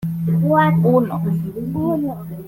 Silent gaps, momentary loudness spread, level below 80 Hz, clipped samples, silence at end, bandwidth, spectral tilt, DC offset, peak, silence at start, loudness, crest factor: none; 9 LU; -50 dBFS; under 0.1%; 0 s; 14.5 kHz; -9.5 dB/octave; under 0.1%; -4 dBFS; 0 s; -18 LUFS; 14 dB